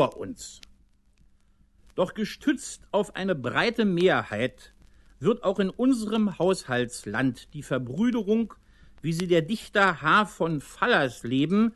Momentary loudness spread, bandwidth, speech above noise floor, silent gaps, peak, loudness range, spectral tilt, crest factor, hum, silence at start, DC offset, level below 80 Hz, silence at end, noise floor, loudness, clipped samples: 10 LU; 12.5 kHz; 35 dB; none; -6 dBFS; 4 LU; -5.5 dB/octave; 20 dB; none; 0 s; under 0.1%; -58 dBFS; 0.05 s; -60 dBFS; -26 LUFS; under 0.1%